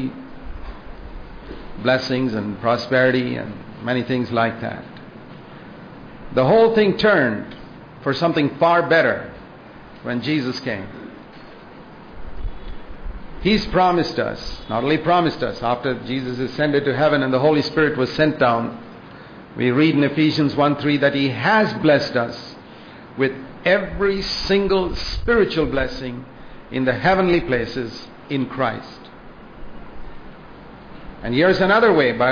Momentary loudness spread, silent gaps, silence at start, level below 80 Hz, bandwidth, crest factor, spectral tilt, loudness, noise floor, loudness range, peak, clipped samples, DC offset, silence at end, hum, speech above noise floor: 23 LU; none; 0 s; -40 dBFS; 5.4 kHz; 16 dB; -6.5 dB/octave; -19 LUFS; -40 dBFS; 8 LU; -4 dBFS; under 0.1%; under 0.1%; 0 s; none; 22 dB